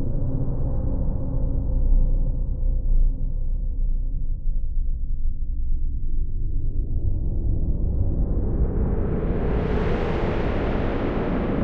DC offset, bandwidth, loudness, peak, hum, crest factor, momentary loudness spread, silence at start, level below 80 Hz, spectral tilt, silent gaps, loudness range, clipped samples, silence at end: under 0.1%; 4 kHz; -27 LUFS; -8 dBFS; none; 14 dB; 6 LU; 0 s; -22 dBFS; -10 dB/octave; none; 6 LU; under 0.1%; 0 s